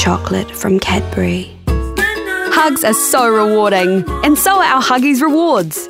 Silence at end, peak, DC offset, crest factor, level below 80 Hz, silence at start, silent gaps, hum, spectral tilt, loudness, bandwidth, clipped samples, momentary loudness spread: 0 s; 0 dBFS; under 0.1%; 12 dB; -30 dBFS; 0 s; none; none; -4 dB/octave; -13 LUFS; 16.5 kHz; under 0.1%; 8 LU